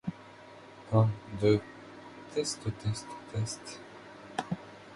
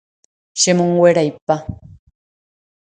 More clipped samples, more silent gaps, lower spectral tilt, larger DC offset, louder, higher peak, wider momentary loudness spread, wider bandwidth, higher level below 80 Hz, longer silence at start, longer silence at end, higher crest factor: neither; second, none vs 1.42-1.47 s; first, -6 dB/octave vs -4.5 dB/octave; neither; second, -33 LUFS vs -15 LUFS; second, -12 dBFS vs 0 dBFS; first, 22 LU vs 13 LU; first, 11.5 kHz vs 9.6 kHz; second, -58 dBFS vs -48 dBFS; second, 0.05 s vs 0.55 s; second, 0 s vs 1.2 s; about the same, 22 dB vs 18 dB